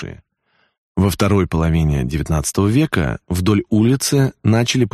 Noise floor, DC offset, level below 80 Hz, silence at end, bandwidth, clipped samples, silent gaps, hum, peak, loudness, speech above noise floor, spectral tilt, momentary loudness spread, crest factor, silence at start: -63 dBFS; under 0.1%; -32 dBFS; 0.05 s; 13 kHz; under 0.1%; 0.78-0.95 s; none; -2 dBFS; -17 LUFS; 47 dB; -5.5 dB/octave; 5 LU; 14 dB; 0 s